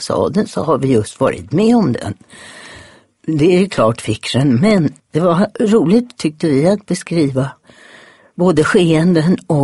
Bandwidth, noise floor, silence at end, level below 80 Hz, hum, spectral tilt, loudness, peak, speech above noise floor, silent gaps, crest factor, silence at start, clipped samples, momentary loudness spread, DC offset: 11.5 kHz; -43 dBFS; 0 s; -46 dBFS; none; -6.5 dB/octave; -14 LUFS; 0 dBFS; 29 dB; none; 14 dB; 0 s; under 0.1%; 11 LU; under 0.1%